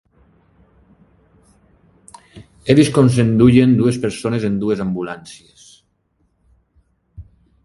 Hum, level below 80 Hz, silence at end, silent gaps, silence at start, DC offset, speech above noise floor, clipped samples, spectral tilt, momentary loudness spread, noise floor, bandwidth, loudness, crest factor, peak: none; -46 dBFS; 0.45 s; none; 2.35 s; under 0.1%; 49 dB; under 0.1%; -7 dB/octave; 17 LU; -64 dBFS; 11.5 kHz; -15 LUFS; 18 dB; 0 dBFS